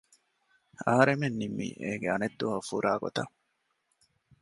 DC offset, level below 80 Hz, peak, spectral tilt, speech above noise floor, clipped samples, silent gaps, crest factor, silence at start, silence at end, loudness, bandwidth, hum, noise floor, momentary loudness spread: under 0.1%; -68 dBFS; -8 dBFS; -6 dB/octave; 48 dB; under 0.1%; none; 24 dB; 0.8 s; 1.15 s; -30 LUFS; 11.5 kHz; none; -77 dBFS; 11 LU